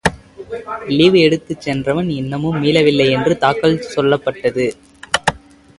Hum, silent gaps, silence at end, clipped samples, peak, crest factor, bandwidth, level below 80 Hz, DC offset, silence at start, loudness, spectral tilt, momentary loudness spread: none; none; 0.4 s; under 0.1%; 0 dBFS; 16 dB; 11.5 kHz; -44 dBFS; under 0.1%; 0.05 s; -16 LUFS; -5.5 dB/octave; 10 LU